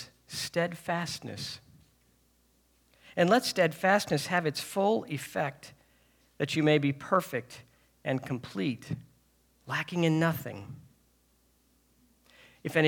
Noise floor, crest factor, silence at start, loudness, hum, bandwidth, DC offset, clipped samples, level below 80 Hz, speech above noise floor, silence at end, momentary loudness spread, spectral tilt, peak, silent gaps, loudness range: -68 dBFS; 22 dB; 0 s; -30 LUFS; none; 20 kHz; under 0.1%; under 0.1%; -70 dBFS; 39 dB; 0 s; 16 LU; -5 dB/octave; -8 dBFS; none; 6 LU